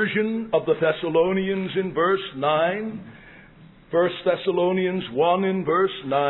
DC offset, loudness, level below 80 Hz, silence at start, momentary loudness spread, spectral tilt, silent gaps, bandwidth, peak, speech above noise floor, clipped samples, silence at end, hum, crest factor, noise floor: under 0.1%; -23 LUFS; -58 dBFS; 0 s; 4 LU; -10 dB/octave; none; 4.1 kHz; -8 dBFS; 26 dB; under 0.1%; 0 s; none; 16 dB; -49 dBFS